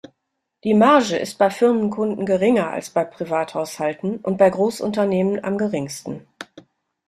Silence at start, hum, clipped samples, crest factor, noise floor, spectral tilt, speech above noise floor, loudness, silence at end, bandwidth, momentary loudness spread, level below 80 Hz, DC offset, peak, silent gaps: 0.65 s; none; under 0.1%; 18 dB; -77 dBFS; -6 dB/octave; 58 dB; -20 LUFS; 0.5 s; 14 kHz; 13 LU; -62 dBFS; under 0.1%; -2 dBFS; none